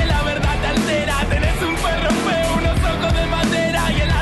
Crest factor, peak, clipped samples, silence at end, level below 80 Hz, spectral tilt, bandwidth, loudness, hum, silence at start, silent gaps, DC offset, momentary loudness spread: 10 dB; -6 dBFS; under 0.1%; 0 s; -24 dBFS; -5 dB/octave; 12.5 kHz; -18 LUFS; none; 0 s; none; under 0.1%; 1 LU